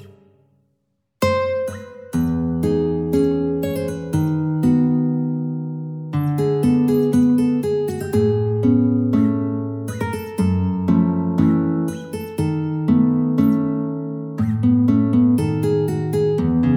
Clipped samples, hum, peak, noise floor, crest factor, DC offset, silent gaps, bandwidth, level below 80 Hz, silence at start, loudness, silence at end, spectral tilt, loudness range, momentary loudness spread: under 0.1%; none; -4 dBFS; -70 dBFS; 16 dB; under 0.1%; none; 16 kHz; -50 dBFS; 0 s; -19 LUFS; 0 s; -8.5 dB/octave; 3 LU; 9 LU